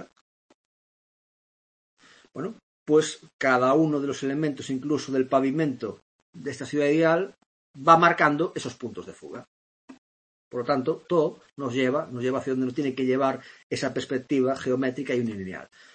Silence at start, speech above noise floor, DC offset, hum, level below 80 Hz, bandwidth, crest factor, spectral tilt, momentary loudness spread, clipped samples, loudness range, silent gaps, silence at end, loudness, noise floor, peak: 0 s; over 65 dB; under 0.1%; none; -70 dBFS; 8.8 kHz; 22 dB; -5.5 dB/octave; 16 LU; under 0.1%; 6 LU; 0.21-1.97 s, 2.63-2.86 s, 3.33-3.39 s, 6.02-6.33 s, 7.46-7.74 s, 9.48-9.88 s, 9.98-10.51 s, 13.63-13.70 s; 0.3 s; -25 LUFS; under -90 dBFS; -4 dBFS